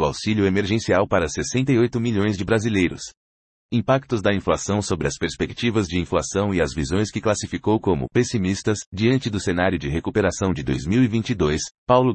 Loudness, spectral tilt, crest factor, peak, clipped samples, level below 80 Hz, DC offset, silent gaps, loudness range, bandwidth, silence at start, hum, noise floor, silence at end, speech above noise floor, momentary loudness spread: -22 LUFS; -5.5 dB/octave; 18 dB; -2 dBFS; under 0.1%; -44 dBFS; under 0.1%; 3.17-3.69 s, 8.86-8.92 s, 11.71-11.87 s; 2 LU; 8.8 kHz; 0 s; none; under -90 dBFS; 0 s; over 69 dB; 5 LU